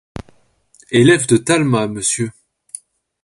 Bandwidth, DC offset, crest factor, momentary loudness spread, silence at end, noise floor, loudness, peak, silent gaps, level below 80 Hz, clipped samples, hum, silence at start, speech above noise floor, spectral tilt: 11.5 kHz; under 0.1%; 18 dB; 22 LU; 0.95 s; -54 dBFS; -15 LUFS; 0 dBFS; none; -48 dBFS; under 0.1%; none; 0.15 s; 40 dB; -4.5 dB/octave